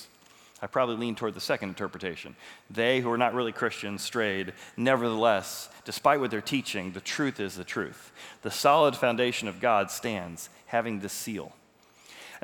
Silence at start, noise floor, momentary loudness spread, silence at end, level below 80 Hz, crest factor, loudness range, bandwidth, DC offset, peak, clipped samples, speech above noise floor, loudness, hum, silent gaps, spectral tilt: 0 s; -59 dBFS; 15 LU; 0.05 s; -74 dBFS; 22 dB; 3 LU; over 20 kHz; under 0.1%; -6 dBFS; under 0.1%; 30 dB; -28 LUFS; none; none; -4 dB/octave